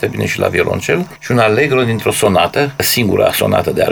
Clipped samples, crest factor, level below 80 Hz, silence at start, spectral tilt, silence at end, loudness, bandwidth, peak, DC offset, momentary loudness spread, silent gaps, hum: under 0.1%; 12 dB; -44 dBFS; 0 s; -4.5 dB/octave; 0 s; -13 LUFS; over 20 kHz; 0 dBFS; under 0.1%; 5 LU; none; none